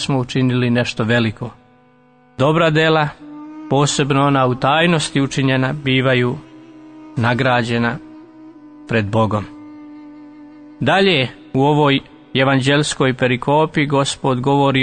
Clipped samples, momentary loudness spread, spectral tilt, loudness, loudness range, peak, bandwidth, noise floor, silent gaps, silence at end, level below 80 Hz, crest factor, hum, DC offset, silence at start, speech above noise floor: under 0.1%; 14 LU; -5.5 dB/octave; -16 LUFS; 4 LU; -2 dBFS; 9.6 kHz; -51 dBFS; none; 0 s; -48 dBFS; 14 dB; none; under 0.1%; 0 s; 35 dB